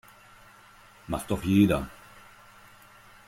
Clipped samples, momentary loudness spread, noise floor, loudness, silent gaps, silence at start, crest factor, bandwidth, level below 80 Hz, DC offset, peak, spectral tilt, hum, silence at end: under 0.1%; 19 LU; -54 dBFS; -26 LUFS; none; 1.1 s; 22 dB; 16.5 kHz; -50 dBFS; under 0.1%; -8 dBFS; -6.5 dB/octave; none; 1.4 s